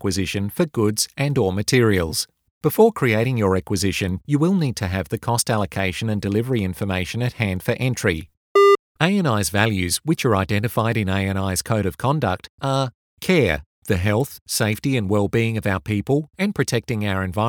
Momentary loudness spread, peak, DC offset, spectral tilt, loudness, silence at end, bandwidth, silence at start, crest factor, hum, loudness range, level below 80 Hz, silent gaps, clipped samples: 7 LU; 0 dBFS; under 0.1%; -5 dB/octave; -21 LUFS; 0 s; over 20 kHz; 0 s; 20 dB; none; 3 LU; -46 dBFS; 2.51-2.61 s, 8.37-8.55 s, 8.79-8.95 s, 12.49-12.58 s, 12.94-13.17 s, 13.66-13.82 s, 14.41-14.46 s; under 0.1%